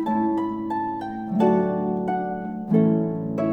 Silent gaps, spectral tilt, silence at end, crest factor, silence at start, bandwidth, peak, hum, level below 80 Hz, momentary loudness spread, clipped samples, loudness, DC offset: none; -10 dB/octave; 0 s; 16 dB; 0 s; 5.8 kHz; -6 dBFS; none; -58 dBFS; 9 LU; under 0.1%; -24 LUFS; under 0.1%